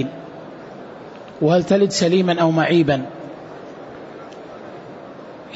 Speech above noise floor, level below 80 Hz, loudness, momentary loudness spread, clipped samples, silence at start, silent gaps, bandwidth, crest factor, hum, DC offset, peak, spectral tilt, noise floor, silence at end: 21 dB; -58 dBFS; -17 LUFS; 21 LU; under 0.1%; 0 s; none; 8 kHz; 16 dB; none; under 0.1%; -4 dBFS; -6 dB/octave; -37 dBFS; 0 s